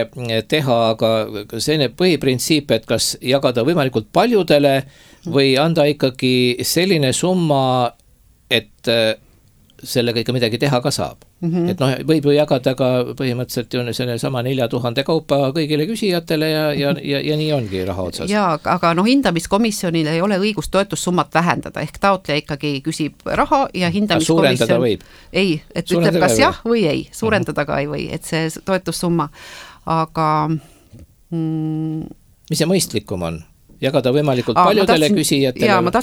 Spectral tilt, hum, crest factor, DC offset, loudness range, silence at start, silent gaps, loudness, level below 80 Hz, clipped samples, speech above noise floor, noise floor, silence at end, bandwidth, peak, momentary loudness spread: -5 dB/octave; none; 18 dB; under 0.1%; 5 LU; 0 s; none; -17 LUFS; -46 dBFS; under 0.1%; 35 dB; -52 dBFS; 0 s; 19.5 kHz; 0 dBFS; 9 LU